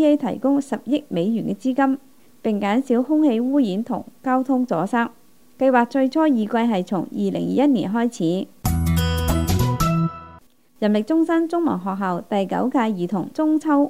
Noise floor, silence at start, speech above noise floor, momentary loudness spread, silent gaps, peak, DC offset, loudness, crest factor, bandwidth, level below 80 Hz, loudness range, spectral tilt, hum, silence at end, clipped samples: -49 dBFS; 0 s; 30 dB; 6 LU; none; -4 dBFS; 0.3%; -21 LUFS; 16 dB; 16 kHz; -40 dBFS; 2 LU; -7 dB/octave; none; 0 s; under 0.1%